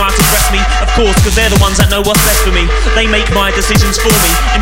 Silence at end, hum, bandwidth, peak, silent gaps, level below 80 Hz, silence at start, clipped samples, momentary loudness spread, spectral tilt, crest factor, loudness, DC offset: 0 s; none; 17 kHz; 0 dBFS; none; -14 dBFS; 0 s; under 0.1%; 3 LU; -3.5 dB/octave; 10 dB; -9 LUFS; under 0.1%